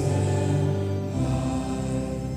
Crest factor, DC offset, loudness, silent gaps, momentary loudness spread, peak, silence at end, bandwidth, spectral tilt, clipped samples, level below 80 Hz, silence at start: 12 dB; under 0.1%; -26 LUFS; none; 4 LU; -14 dBFS; 0 s; 11 kHz; -7 dB/octave; under 0.1%; -40 dBFS; 0 s